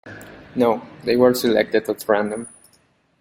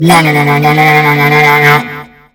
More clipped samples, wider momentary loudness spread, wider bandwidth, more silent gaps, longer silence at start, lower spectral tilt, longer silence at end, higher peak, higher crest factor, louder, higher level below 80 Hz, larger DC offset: second, under 0.1% vs 3%; first, 20 LU vs 7 LU; second, 16.5 kHz vs 19.5 kHz; neither; about the same, 0.05 s vs 0 s; about the same, -5 dB/octave vs -5.5 dB/octave; first, 0.75 s vs 0.3 s; about the same, -2 dBFS vs 0 dBFS; first, 18 dB vs 8 dB; second, -20 LUFS vs -6 LUFS; second, -58 dBFS vs -44 dBFS; neither